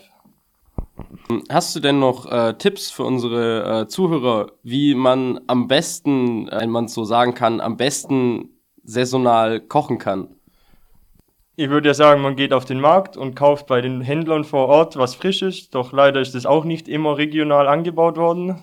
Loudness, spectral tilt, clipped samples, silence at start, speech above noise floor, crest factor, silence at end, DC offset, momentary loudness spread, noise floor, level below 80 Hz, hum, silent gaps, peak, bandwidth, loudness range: -18 LUFS; -5 dB/octave; under 0.1%; 0.8 s; 41 dB; 18 dB; 0.05 s; under 0.1%; 9 LU; -59 dBFS; -50 dBFS; none; none; -2 dBFS; 16 kHz; 4 LU